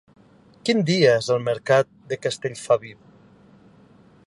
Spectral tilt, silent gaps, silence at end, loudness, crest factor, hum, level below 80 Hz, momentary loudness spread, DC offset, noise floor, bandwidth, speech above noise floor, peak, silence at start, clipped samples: -5 dB/octave; none; 1.35 s; -22 LUFS; 20 dB; none; -64 dBFS; 11 LU; under 0.1%; -52 dBFS; 11.5 kHz; 31 dB; -4 dBFS; 0.65 s; under 0.1%